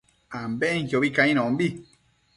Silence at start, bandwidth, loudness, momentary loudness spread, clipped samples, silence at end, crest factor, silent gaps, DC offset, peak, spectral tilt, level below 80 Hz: 0.3 s; 11.5 kHz; -24 LUFS; 16 LU; under 0.1%; 0.55 s; 20 dB; none; under 0.1%; -4 dBFS; -6 dB/octave; -62 dBFS